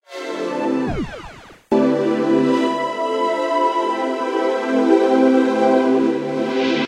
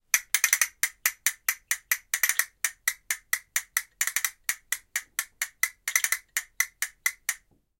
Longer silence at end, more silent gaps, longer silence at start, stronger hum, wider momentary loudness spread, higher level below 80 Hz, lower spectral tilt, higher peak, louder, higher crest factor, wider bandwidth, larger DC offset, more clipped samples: second, 0 s vs 0.45 s; neither; about the same, 0.1 s vs 0.15 s; neither; about the same, 10 LU vs 9 LU; first, -46 dBFS vs -70 dBFS; first, -6 dB/octave vs 5 dB/octave; about the same, -2 dBFS vs -2 dBFS; first, -18 LUFS vs -27 LUFS; second, 16 dB vs 28 dB; second, 10.5 kHz vs 17.5 kHz; neither; neither